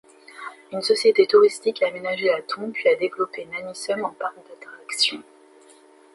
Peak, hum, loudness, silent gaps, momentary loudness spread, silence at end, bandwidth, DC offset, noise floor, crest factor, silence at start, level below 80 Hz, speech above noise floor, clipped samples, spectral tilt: -4 dBFS; none; -22 LUFS; none; 22 LU; 0.95 s; 11.5 kHz; under 0.1%; -52 dBFS; 20 dB; 0.35 s; -74 dBFS; 30 dB; under 0.1%; -2.5 dB/octave